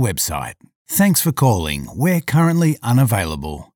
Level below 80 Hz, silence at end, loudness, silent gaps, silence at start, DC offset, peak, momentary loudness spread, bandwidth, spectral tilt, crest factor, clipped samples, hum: -38 dBFS; 0.1 s; -17 LUFS; 0.75-0.85 s; 0 s; under 0.1%; -4 dBFS; 10 LU; 19 kHz; -5.5 dB/octave; 14 dB; under 0.1%; none